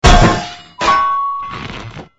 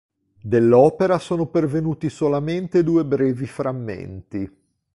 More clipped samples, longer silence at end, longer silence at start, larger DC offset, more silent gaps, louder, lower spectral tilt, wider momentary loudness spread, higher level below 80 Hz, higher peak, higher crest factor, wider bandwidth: first, 0.4% vs under 0.1%; second, 0.15 s vs 0.5 s; second, 0 s vs 0.45 s; neither; neither; first, -14 LUFS vs -20 LUFS; second, -4.5 dB/octave vs -8.5 dB/octave; about the same, 17 LU vs 16 LU; first, -20 dBFS vs -52 dBFS; about the same, 0 dBFS vs -2 dBFS; about the same, 14 dB vs 18 dB; about the same, 11 kHz vs 11.5 kHz